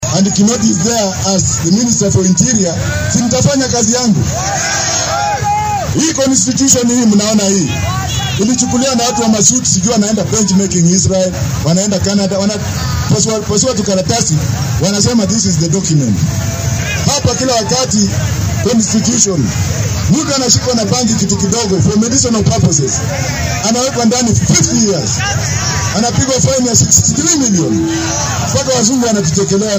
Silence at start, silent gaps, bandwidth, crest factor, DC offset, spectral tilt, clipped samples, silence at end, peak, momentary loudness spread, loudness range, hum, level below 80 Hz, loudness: 0 s; none; over 20 kHz; 12 dB; under 0.1%; -4 dB/octave; under 0.1%; 0 s; 0 dBFS; 5 LU; 2 LU; none; -32 dBFS; -11 LUFS